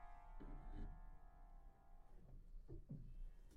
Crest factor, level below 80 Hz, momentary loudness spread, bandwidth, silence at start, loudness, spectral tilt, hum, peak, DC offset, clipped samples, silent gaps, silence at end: 14 dB; -56 dBFS; 10 LU; 4.2 kHz; 0 s; -62 LUFS; -8 dB/octave; none; -42 dBFS; under 0.1%; under 0.1%; none; 0 s